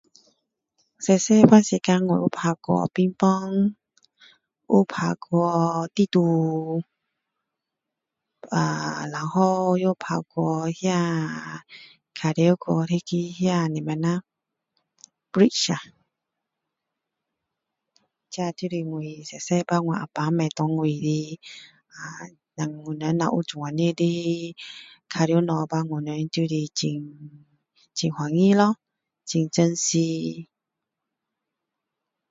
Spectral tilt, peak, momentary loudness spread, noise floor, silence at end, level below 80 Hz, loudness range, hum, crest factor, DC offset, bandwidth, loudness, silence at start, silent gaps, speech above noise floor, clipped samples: -6 dB/octave; 0 dBFS; 14 LU; -85 dBFS; 1.85 s; -68 dBFS; 6 LU; none; 24 dB; under 0.1%; 7.8 kHz; -23 LUFS; 1 s; none; 62 dB; under 0.1%